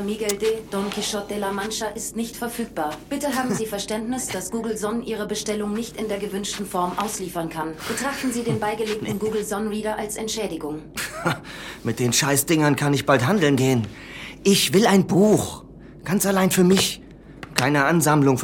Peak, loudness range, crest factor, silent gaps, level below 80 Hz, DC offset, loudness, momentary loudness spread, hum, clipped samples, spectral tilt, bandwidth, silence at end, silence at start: 0 dBFS; 7 LU; 22 dB; none; -50 dBFS; under 0.1%; -22 LUFS; 11 LU; none; under 0.1%; -4.5 dB/octave; 17.5 kHz; 0 s; 0 s